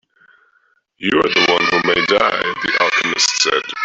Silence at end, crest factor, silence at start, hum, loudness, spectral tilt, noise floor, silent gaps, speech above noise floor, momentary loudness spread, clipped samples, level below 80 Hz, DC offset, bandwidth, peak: 0 s; 16 dB; 1 s; none; -14 LUFS; -2 dB/octave; -60 dBFS; none; 44 dB; 5 LU; under 0.1%; -54 dBFS; under 0.1%; 8.4 kHz; -2 dBFS